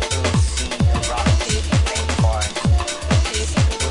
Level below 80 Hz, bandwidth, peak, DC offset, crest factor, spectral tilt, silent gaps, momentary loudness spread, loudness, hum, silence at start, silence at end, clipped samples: -24 dBFS; 11 kHz; -6 dBFS; under 0.1%; 12 dB; -4.5 dB/octave; none; 2 LU; -19 LUFS; none; 0 s; 0 s; under 0.1%